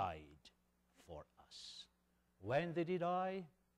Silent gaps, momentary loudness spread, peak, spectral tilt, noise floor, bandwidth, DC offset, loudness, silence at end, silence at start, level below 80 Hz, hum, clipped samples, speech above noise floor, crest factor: none; 19 LU; -26 dBFS; -6.5 dB/octave; -79 dBFS; 12 kHz; under 0.1%; -42 LUFS; 0.3 s; 0 s; -72 dBFS; none; under 0.1%; 39 dB; 18 dB